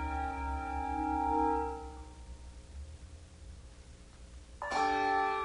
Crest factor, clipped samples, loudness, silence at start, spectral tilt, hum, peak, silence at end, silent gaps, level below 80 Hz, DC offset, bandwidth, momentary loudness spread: 16 dB; under 0.1%; -34 LUFS; 0 s; -5.5 dB/octave; none; -20 dBFS; 0 s; none; -46 dBFS; under 0.1%; 10.5 kHz; 23 LU